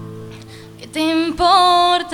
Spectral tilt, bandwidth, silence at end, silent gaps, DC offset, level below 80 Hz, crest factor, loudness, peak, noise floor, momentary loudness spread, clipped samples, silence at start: -4 dB/octave; 16 kHz; 0 s; none; under 0.1%; -44 dBFS; 16 dB; -14 LUFS; -2 dBFS; -37 dBFS; 23 LU; under 0.1%; 0 s